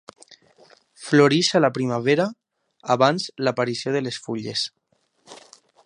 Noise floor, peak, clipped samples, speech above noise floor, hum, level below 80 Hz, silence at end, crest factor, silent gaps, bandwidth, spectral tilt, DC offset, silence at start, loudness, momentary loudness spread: -67 dBFS; -2 dBFS; under 0.1%; 46 dB; none; -70 dBFS; 0.5 s; 22 dB; none; 11 kHz; -5 dB/octave; under 0.1%; 1 s; -21 LUFS; 12 LU